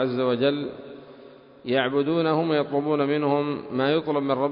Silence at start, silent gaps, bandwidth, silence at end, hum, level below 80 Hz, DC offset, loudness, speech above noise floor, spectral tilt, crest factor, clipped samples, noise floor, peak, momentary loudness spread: 0 s; none; 5.4 kHz; 0 s; none; -66 dBFS; under 0.1%; -24 LUFS; 24 dB; -11 dB/octave; 16 dB; under 0.1%; -48 dBFS; -8 dBFS; 13 LU